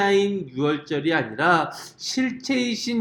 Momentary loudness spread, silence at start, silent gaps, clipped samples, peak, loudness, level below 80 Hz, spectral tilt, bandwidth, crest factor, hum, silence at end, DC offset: 7 LU; 0 s; none; under 0.1%; -6 dBFS; -23 LUFS; -66 dBFS; -4.5 dB/octave; 17.5 kHz; 18 dB; none; 0 s; under 0.1%